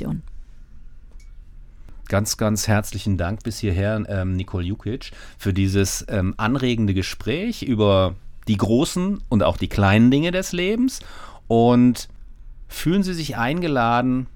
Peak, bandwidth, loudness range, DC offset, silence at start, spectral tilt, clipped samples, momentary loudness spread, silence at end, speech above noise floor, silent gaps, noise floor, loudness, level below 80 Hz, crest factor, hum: -4 dBFS; 18 kHz; 5 LU; under 0.1%; 0 s; -5.5 dB/octave; under 0.1%; 12 LU; 0.05 s; 20 dB; none; -40 dBFS; -21 LUFS; -38 dBFS; 18 dB; none